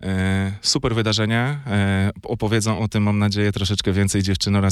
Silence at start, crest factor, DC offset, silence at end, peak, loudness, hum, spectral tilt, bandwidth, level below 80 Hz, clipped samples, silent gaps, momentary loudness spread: 0 s; 14 dB; under 0.1%; 0 s; -6 dBFS; -20 LUFS; none; -5 dB/octave; 13 kHz; -42 dBFS; under 0.1%; none; 3 LU